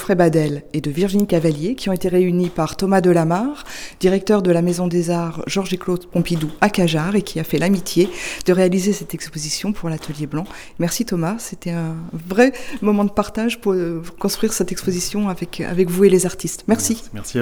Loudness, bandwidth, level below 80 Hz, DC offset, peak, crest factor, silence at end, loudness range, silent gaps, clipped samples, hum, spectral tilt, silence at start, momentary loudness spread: -19 LUFS; over 20 kHz; -42 dBFS; under 0.1%; 0 dBFS; 18 dB; 0 s; 3 LU; none; under 0.1%; none; -5.5 dB/octave; 0 s; 10 LU